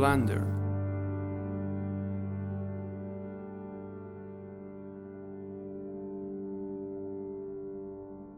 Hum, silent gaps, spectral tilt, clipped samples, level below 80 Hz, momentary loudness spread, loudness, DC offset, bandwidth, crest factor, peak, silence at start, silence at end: none; none; -8 dB/octave; under 0.1%; -58 dBFS; 13 LU; -37 LUFS; under 0.1%; 13 kHz; 24 dB; -12 dBFS; 0 s; 0 s